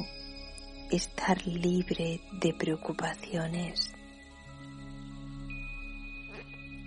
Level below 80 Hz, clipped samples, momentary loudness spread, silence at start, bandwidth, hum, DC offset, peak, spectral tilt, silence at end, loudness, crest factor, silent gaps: -48 dBFS; under 0.1%; 16 LU; 0 s; 10.5 kHz; none; under 0.1%; -12 dBFS; -5 dB/octave; 0 s; -34 LUFS; 22 dB; none